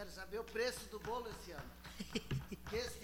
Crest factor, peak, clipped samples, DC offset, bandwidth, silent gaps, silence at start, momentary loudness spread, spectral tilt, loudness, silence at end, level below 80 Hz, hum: 20 dB; -24 dBFS; under 0.1%; under 0.1%; over 20 kHz; none; 0 s; 11 LU; -4.5 dB/octave; -45 LUFS; 0 s; -58 dBFS; none